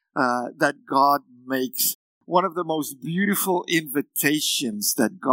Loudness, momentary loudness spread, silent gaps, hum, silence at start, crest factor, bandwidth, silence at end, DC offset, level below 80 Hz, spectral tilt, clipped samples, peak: -23 LUFS; 7 LU; 1.95-2.21 s; none; 0.15 s; 20 dB; 16.5 kHz; 0 s; under 0.1%; -80 dBFS; -3 dB/octave; under 0.1%; -4 dBFS